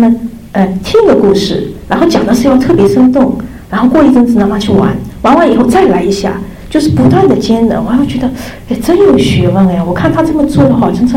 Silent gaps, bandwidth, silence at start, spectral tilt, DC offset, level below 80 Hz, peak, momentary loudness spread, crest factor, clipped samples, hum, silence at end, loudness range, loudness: none; 16 kHz; 0 s; -7 dB/octave; under 0.1%; -30 dBFS; 0 dBFS; 9 LU; 8 dB; under 0.1%; none; 0 s; 2 LU; -9 LUFS